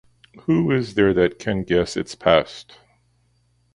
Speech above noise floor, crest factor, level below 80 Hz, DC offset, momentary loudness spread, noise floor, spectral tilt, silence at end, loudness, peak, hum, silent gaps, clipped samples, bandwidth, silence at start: 43 dB; 22 dB; -46 dBFS; under 0.1%; 12 LU; -63 dBFS; -6 dB/octave; 1.1 s; -20 LUFS; 0 dBFS; 60 Hz at -50 dBFS; none; under 0.1%; 11.5 kHz; 0.5 s